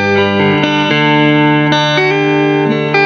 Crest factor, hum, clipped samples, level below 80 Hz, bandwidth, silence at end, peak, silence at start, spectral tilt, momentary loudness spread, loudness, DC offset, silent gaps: 10 dB; none; under 0.1%; -52 dBFS; 6.8 kHz; 0 s; 0 dBFS; 0 s; -6 dB/octave; 2 LU; -10 LUFS; under 0.1%; none